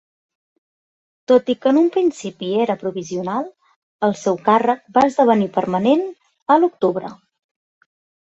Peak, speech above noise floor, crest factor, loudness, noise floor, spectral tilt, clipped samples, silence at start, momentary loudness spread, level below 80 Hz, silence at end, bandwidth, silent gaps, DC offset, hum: -2 dBFS; over 73 dB; 18 dB; -18 LUFS; under -90 dBFS; -6 dB/octave; under 0.1%; 1.3 s; 13 LU; -64 dBFS; 1.15 s; 8.2 kHz; 3.76-3.99 s, 6.42-6.46 s; under 0.1%; none